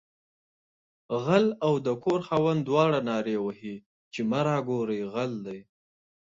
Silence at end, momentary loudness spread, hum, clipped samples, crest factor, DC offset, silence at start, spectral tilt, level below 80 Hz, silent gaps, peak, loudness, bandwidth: 0.65 s; 16 LU; none; under 0.1%; 20 dB; under 0.1%; 1.1 s; -7 dB/octave; -68 dBFS; 3.86-4.11 s; -8 dBFS; -27 LUFS; 7.8 kHz